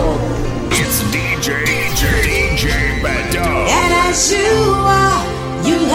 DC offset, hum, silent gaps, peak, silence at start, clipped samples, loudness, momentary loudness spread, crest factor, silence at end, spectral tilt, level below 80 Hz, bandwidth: under 0.1%; none; none; 0 dBFS; 0 s; under 0.1%; -14 LUFS; 6 LU; 14 dB; 0 s; -4 dB/octave; -24 dBFS; 16.5 kHz